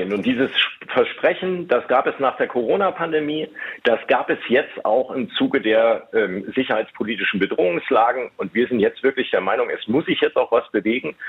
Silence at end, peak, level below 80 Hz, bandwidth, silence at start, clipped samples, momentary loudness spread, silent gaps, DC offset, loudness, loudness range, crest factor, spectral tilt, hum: 0 s; -4 dBFS; -64 dBFS; 5.2 kHz; 0 s; under 0.1%; 5 LU; none; under 0.1%; -20 LUFS; 1 LU; 16 dB; -7 dB/octave; none